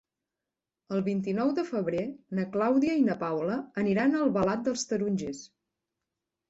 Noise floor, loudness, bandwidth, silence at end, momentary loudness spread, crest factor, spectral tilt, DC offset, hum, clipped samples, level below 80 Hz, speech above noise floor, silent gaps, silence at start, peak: -89 dBFS; -29 LUFS; 8 kHz; 1.05 s; 9 LU; 16 dB; -6 dB/octave; under 0.1%; none; under 0.1%; -66 dBFS; 61 dB; none; 0.9 s; -14 dBFS